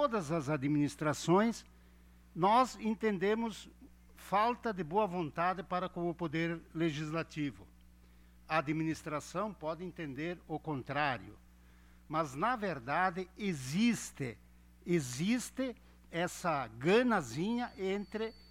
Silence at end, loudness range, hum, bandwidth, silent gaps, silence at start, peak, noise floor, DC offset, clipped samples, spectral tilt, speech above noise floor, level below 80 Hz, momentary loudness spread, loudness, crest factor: 0.1 s; 6 LU; 60 Hz at -60 dBFS; 16 kHz; none; 0 s; -16 dBFS; -60 dBFS; under 0.1%; under 0.1%; -5.5 dB/octave; 26 dB; -62 dBFS; 11 LU; -35 LUFS; 18 dB